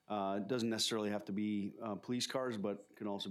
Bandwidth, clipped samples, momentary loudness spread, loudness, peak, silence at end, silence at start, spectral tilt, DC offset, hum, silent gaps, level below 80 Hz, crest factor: 15.5 kHz; under 0.1%; 8 LU; -39 LUFS; -22 dBFS; 0 s; 0.1 s; -4 dB/octave; under 0.1%; none; none; -88 dBFS; 16 dB